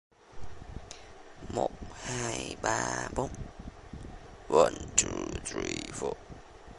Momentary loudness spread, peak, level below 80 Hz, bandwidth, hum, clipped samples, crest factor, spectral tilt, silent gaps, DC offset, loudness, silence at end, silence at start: 24 LU; -4 dBFS; -50 dBFS; 11.5 kHz; none; under 0.1%; 30 dB; -3 dB/octave; none; under 0.1%; -31 LUFS; 0 s; 0.25 s